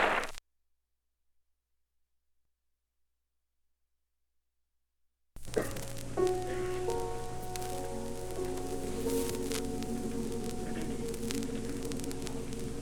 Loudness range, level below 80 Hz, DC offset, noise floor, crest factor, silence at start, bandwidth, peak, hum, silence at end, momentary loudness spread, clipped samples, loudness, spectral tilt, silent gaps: 7 LU; -46 dBFS; under 0.1%; -81 dBFS; 24 dB; 0 s; 19.5 kHz; -12 dBFS; none; 0 s; 7 LU; under 0.1%; -37 LUFS; -4.5 dB/octave; none